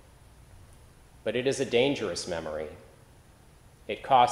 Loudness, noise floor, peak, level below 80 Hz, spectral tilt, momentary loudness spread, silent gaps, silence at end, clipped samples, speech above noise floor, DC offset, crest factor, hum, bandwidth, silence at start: -29 LUFS; -55 dBFS; -8 dBFS; -58 dBFS; -4 dB/octave; 16 LU; none; 0 s; under 0.1%; 29 dB; under 0.1%; 22 dB; none; 15 kHz; 1.25 s